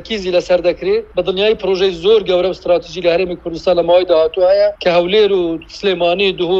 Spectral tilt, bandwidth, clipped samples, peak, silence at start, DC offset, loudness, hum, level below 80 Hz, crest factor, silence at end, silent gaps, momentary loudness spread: -5.5 dB/octave; 7.6 kHz; under 0.1%; -2 dBFS; 0 s; under 0.1%; -14 LUFS; none; -42 dBFS; 12 dB; 0 s; none; 6 LU